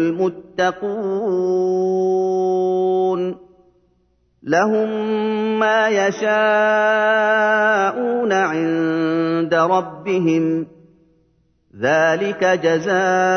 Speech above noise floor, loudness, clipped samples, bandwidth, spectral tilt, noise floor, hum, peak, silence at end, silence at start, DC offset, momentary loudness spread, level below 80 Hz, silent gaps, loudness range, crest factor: 44 dB; -18 LUFS; under 0.1%; 6.6 kHz; -5.5 dB/octave; -62 dBFS; none; -4 dBFS; 0 s; 0 s; under 0.1%; 7 LU; -64 dBFS; none; 4 LU; 16 dB